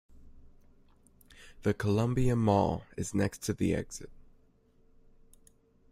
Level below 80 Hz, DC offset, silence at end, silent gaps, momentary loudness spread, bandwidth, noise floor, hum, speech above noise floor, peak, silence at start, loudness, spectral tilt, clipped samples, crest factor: -50 dBFS; under 0.1%; 1.75 s; none; 12 LU; 15.5 kHz; -64 dBFS; none; 35 dB; -12 dBFS; 0.15 s; -31 LUFS; -6.5 dB/octave; under 0.1%; 20 dB